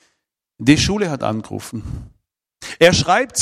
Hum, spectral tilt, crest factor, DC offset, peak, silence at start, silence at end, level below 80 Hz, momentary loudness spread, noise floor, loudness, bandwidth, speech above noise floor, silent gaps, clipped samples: none; -4 dB/octave; 18 dB; under 0.1%; 0 dBFS; 0.6 s; 0 s; -40 dBFS; 20 LU; -73 dBFS; -16 LUFS; 15 kHz; 56 dB; none; 0.1%